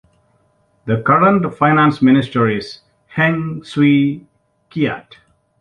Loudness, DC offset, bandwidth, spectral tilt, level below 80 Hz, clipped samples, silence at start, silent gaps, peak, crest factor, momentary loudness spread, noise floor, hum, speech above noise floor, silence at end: -15 LUFS; under 0.1%; 9.4 kHz; -8 dB/octave; -54 dBFS; under 0.1%; 0.85 s; none; -2 dBFS; 14 dB; 17 LU; -59 dBFS; none; 44 dB; 0.6 s